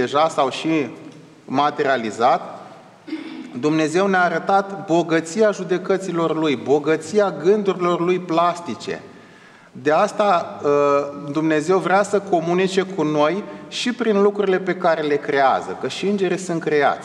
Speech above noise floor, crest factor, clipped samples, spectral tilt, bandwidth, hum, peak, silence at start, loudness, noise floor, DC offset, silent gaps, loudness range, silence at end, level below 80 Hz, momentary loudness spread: 27 dB; 16 dB; under 0.1%; -5.5 dB/octave; 11 kHz; none; -4 dBFS; 0 s; -19 LUFS; -46 dBFS; under 0.1%; none; 2 LU; 0 s; -74 dBFS; 10 LU